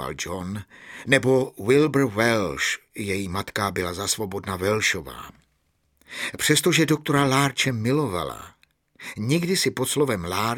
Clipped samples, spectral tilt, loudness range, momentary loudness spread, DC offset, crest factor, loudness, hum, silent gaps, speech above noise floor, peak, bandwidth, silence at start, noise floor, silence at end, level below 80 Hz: under 0.1%; -4 dB/octave; 4 LU; 15 LU; under 0.1%; 22 dB; -23 LUFS; none; none; 45 dB; -2 dBFS; 17.5 kHz; 0 s; -69 dBFS; 0 s; -54 dBFS